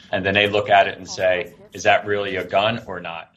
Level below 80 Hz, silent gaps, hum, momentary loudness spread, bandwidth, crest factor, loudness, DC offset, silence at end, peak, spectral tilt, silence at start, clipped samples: -58 dBFS; none; none; 12 LU; 13 kHz; 18 dB; -19 LUFS; under 0.1%; 0.1 s; -2 dBFS; -4 dB/octave; 0.1 s; under 0.1%